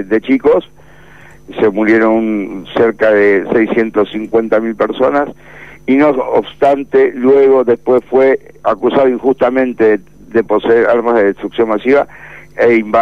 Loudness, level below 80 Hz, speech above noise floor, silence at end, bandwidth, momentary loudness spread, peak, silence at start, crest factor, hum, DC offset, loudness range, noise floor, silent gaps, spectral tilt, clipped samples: -12 LUFS; -48 dBFS; 28 dB; 0 s; 6.4 kHz; 7 LU; -2 dBFS; 0 s; 10 dB; none; 0.8%; 2 LU; -40 dBFS; none; -7.5 dB/octave; under 0.1%